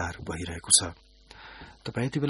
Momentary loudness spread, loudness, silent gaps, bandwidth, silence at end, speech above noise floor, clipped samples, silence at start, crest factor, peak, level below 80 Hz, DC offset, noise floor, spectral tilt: 25 LU; -25 LUFS; none; 11.5 kHz; 0 s; 21 dB; under 0.1%; 0 s; 26 dB; -6 dBFS; -50 dBFS; under 0.1%; -49 dBFS; -2.5 dB/octave